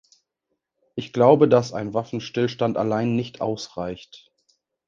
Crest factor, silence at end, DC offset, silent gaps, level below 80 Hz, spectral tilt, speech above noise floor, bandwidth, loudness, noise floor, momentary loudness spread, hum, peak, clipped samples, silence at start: 22 dB; 0.7 s; under 0.1%; none; -60 dBFS; -7 dB/octave; 57 dB; 7.6 kHz; -22 LUFS; -79 dBFS; 16 LU; none; -2 dBFS; under 0.1%; 0.95 s